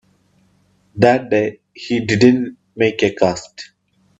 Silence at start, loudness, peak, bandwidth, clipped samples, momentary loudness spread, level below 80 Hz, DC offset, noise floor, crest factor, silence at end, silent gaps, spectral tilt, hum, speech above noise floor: 0.95 s; -16 LUFS; 0 dBFS; 8 kHz; under 0.1%; 22 LU; -54 dBFS; under 0.1%; -58 dBFS; 18 dB; 0.55 s; none; -6 dB/octave; none; 42 dB